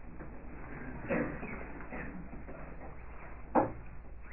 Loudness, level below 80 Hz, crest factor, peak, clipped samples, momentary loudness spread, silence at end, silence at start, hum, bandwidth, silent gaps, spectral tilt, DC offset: -40 LUFS; -50 dBFS; 24 dB; -16 dBFS; under 0.1%; 17 LU; 0 s; 0 s; none; 3.1 kHz; none; -8 dB/octave; 0.3%